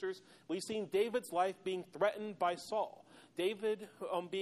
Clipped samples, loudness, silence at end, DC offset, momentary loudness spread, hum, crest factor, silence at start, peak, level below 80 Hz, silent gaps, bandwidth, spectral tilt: under 0.1%; -38 LUFS; 0 s; under 0.1%; 8 LU; none; 18 dB; 0 s; -20 dBFS; -84 dBFS; none; 13.5 kHz; -4.5 dB/octave